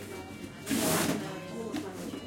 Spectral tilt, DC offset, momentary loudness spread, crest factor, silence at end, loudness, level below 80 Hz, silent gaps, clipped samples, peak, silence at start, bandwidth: -3.5 dB/octave; under 0.1%; 14 LU; 18 dB; 0 s; -33 LUFS; -62 dBFS; none; under 0.1%; -16 dBFS; 0 s; 16.5 kHz